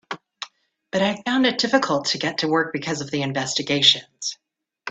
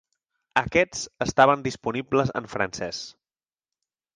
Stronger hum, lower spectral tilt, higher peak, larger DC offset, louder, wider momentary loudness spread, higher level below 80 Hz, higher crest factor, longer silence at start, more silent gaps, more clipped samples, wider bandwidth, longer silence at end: neither; second, -3 dB/octave vs -4.5 dB/octave; first, 0 dBFS vs -4 dBFS; neither; first, -21 LUFS vs -24 LUFS; first, 19 LU vs 13 LU; second, -64 dBFS vs -54 dBFS; about the same, 22 dB vs 22 dB; second, 0.1 s vs 0.55 s; neither; neither; second, 9 kHz vs 10 kHz; second, 0 s vs 1.05 s